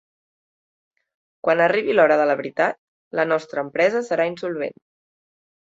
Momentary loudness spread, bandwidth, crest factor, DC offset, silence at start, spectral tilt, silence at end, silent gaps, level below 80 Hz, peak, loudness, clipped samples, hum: 12 LU; 7.8 kHz; 20 dB; under 0.1%; 1.45 s; -5.5 dB/octave; 1.05 s; 2.78-3.11 s; -70 dBFS; -2 dBFS; -21 LUFS; under 0.1%; none